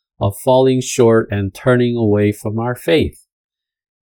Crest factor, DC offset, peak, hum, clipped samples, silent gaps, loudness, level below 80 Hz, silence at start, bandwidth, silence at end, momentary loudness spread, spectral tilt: 16 dB; under 0.1%; 0 dBFS; none; under 0.1%; none; -15 LUFS; -44 dBFS; 0.2 s; 18 kHz; 0.95 s; 8 LU; -6 dB/octave